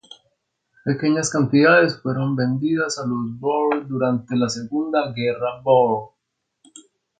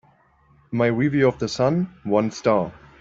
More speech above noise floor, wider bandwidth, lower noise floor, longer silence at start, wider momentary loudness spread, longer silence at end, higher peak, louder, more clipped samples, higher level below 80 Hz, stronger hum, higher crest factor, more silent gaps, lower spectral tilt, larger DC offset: first, 51 dB vs 37 dB; first, 9.4 kHz vs 7.8 kHz; first, -71 dBFS vs -58 dBFS; second, 0.1 s vs 0.7 s; first, 9 LU vs 6 LU; first, 1.1 s vs 0.3 s; about the same, -4 dBFS vs -6 dBFS; about the same, -20 LUFS vs -22 LUFS; neither; second, -62 dBFS vs -54 dBFS; neither; about the same, 18 dB vs 16 dB; neither; about the same, -5.5 dB/octave vs -6.5 dB/octave; neither